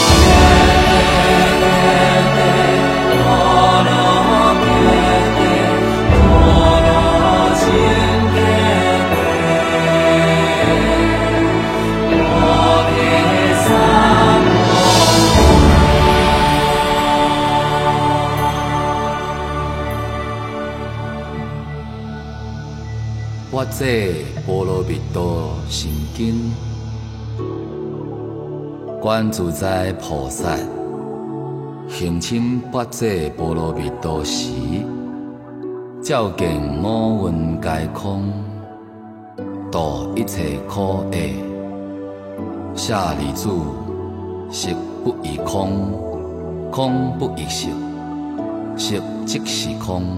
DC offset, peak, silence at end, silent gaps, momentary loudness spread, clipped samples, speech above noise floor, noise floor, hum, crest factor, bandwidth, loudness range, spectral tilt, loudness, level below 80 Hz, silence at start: under 0.1%; 0 dBFS; 0 s; none; 17 LU; under 0.1%; 16 dB; -37 dBFS; none; 16 dB; 16.5 kHz; 12 LU; -5 dB/octave; -15 LUFS; -26 dBFS; 0 s